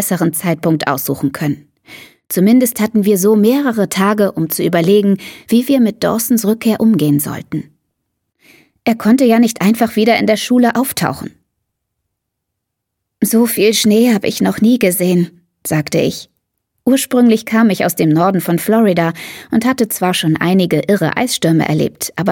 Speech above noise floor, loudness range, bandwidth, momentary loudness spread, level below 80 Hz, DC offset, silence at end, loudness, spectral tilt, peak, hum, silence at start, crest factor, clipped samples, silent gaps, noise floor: 63 dB; 3 LU; 17.5 kHz; 8 LU; -54 dBFS; under 0.1%; 0 s; -13 LUFS; -5 dB/octave; 0 dBFS; none; 0 s; 14 dB; under 0.1%; none; -76 dBFS